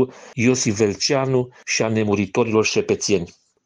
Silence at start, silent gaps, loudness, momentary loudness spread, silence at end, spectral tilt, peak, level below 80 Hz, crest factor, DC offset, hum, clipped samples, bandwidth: 0 s; none; -20 LUFS; 5 LU; 0.35 s; -4.5 dB/octave; -4 dBFS; -56 dBFS; 16 dB; under 0.1%; none; under 0.1%; 10.5 kHz